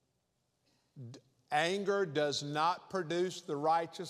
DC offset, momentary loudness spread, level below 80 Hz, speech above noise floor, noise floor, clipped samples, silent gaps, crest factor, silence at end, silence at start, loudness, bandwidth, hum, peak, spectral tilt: under 0.1%; 19 LU; -86 dBFS; 46 dB; -80 dBFS; under 0.1%; none; 20 dB; 0 s; 0.95 s; -34 LUFS; 13.5 kHz; none; -16 dBFS; -4.5 dB/octave